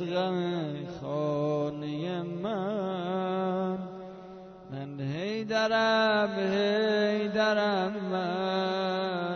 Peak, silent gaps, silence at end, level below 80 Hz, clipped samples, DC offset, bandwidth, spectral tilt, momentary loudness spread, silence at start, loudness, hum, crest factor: -14 dBFS; none; 0 s; -68 dBFS; under 0.1%; under 0.1%; 6.6 kHz; -6 dB/octave; 12 LU; 0 s; -29 LUFS; none; 16 dB